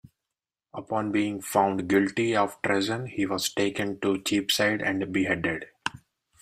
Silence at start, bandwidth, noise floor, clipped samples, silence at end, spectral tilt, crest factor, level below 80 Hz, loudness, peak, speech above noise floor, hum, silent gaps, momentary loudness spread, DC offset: 0.75 s; 15.5 kHz; -88 dBFS; under 0.1%; 0.45 s; -4 dB/octave; 20 dB; -64 dBFS; -26 LUFS; -8 dBFS; 62 dB; none; none; 9 LU; under 0.1%